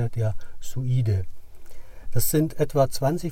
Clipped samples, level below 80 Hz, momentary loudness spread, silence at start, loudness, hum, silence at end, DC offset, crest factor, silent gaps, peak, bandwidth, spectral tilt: under 0.1%; -38 dBFS; 12 LU; 0 s; -25 LUFS; none; 0 s; under 0.1%; 16 dB; none; -8 dBFS; 16.5 kHz; -6 dB/octave